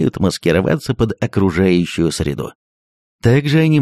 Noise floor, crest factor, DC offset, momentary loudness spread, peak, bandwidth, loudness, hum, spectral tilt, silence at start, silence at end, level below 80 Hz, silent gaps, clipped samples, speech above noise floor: under -90 dBFS; 14 dB; under 0.1%; 8 LU; -2 dBFS; 14 kHz; -16 LUFS; none; -6.5 dB/octave; 0 s; 0 s; -38 dBFS; 2.55-3.19 s; under 0.1%; over 75 dB